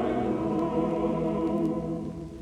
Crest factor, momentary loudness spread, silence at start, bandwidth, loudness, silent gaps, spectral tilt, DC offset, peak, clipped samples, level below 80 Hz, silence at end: 14 dB; 6 LU; 0 s; 10 kHz; -29 LUFS; none; -8.5 dB/octave; under 0.1%; -14 dBFS; under 0.1%; -48 dBFS; 0 s